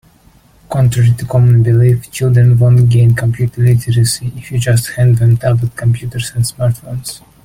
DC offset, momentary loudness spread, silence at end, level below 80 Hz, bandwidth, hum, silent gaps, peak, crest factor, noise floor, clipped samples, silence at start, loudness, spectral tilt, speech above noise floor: under 0.1%; 11 LU; 0.3 s; -38 dBFS; 15.5 kHz; none; none; -2 dBFS; 10 dB; -46 dBFS; under 0.1%; 0.7 s; -12 LUFS; -6.5 dB/octave; 36 dB